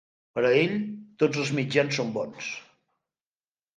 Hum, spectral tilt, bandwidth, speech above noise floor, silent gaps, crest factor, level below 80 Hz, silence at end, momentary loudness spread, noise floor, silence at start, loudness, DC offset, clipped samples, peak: none; -5.5 dB/octave; 9.6 kHz; over 64 dB; none; 22 dB; -70 dBFS; 1.15 s; 13 LU; under -90 dBFS; 0.35 s; -26 LUFS; under 0.1%; under 0.1%; -6 dBFS